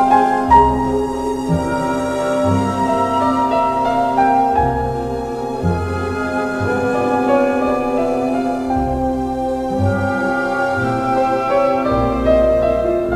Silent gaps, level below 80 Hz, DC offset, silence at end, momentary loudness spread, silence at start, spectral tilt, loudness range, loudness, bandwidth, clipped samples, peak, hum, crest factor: none; -34 dBFS; under 0.1%; 0 s; 7 LU; 0 s; -7 dB/octave; 2 LU; -17 LUFS; 14 kHz; under 0.1%; 0 dBFS; none; 16 dB